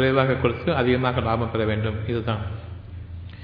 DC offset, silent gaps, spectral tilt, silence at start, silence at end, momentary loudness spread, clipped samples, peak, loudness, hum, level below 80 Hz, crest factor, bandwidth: under 0.1%; none; -10 dB/octave; 0 s; 0 s; 18 LU; under 0.1%; -4 dBFS; -23 LUFS; none; -42 dBFS; 18 dB; 5.2 kHz